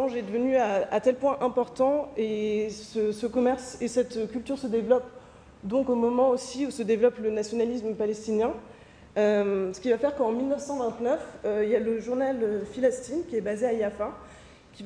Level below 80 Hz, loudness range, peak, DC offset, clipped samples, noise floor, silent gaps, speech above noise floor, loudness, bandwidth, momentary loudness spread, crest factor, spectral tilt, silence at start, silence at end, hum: -58 dBFS; 2 LU; -10 dBFS; under 0.1%; under 0.1%; -51 dBFS; none; 24 dB; -27 LUFS; 10.5 kHz; 7 LU; 18 dB; -5.5 dB/octave; 0 s; 0 s; none